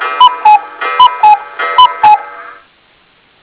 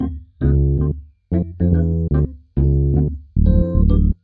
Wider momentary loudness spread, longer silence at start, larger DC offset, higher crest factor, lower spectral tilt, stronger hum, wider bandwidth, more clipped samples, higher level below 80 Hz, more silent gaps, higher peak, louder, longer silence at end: about the same, 7 LU vs 7 LU; about the same, 0 s vs 0 s; neither; about the same, 10 dB vs 14 dB; second, -4 dB/octave vs -13.5 dB/octave; neither; first, 4 kHz vs 1.9 kHz; first, 4% vs under 0.1%; second, -52 dBFS vs -20 dBFS; neither; about the same, 0 dBFS vs -2 dBFS; first, -8 LUFS vs -19 LUFS; first, 0.9 s vs 0.1 s